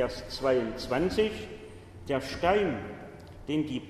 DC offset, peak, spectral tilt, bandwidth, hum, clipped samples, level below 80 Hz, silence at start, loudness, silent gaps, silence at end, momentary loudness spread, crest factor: under 0.1%; -12 dBFS; -5.5 dB/octave; 13.5 kHz; none; under 0.1%; -50 dBFS; 0 s; -30 LUFS; none; 0 s; 19 LU; 18 dB